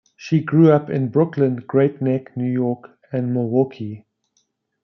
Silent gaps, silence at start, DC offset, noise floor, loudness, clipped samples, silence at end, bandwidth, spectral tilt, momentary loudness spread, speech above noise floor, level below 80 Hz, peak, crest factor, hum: none; 0.2 s; under 0.1%; -68 dBFS; -19 LUFS; under 0.1%; 0.85 s; 6.4 kHz; -9.5 dB/octave; 14 LU; 50 dB; -68 dBFS; -2 dBFS; 18 dB; none